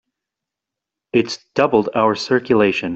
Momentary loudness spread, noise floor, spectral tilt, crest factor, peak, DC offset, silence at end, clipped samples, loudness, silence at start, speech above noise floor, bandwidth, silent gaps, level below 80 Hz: 5 LU; -85 dBFS; -5.5 dB/octave; 16 dB; -2 dBFS; under 0.1%; 0 s; under 0.1%; -17 LUFS; 1.15 s; 68 dB; 8 kHz; none; -58 dBFS